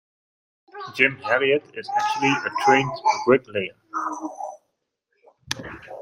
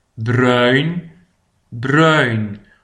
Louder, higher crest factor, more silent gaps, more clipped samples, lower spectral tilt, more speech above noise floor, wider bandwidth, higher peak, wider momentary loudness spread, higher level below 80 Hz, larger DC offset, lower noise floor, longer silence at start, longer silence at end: second, -22 LUFS vs -15 LUFS; first, 24 dB vs 16 dB; neither; neither; second, -4 dB/octave vs -6.5 dB/octave; first, 53 dB vs 44 dB; first, 15.5 kHz vs 10.5 kHz; about the same, 0 dBFS vs 0 dBFS; about the same, 15 LU vs 16 LU; second, -62 dBFS vs -54 dBFS; neither; first, -76 dBFS vs -59 dBFS; first, 0.75 s vs 0.15 s; second, 0 s vs 0.25 s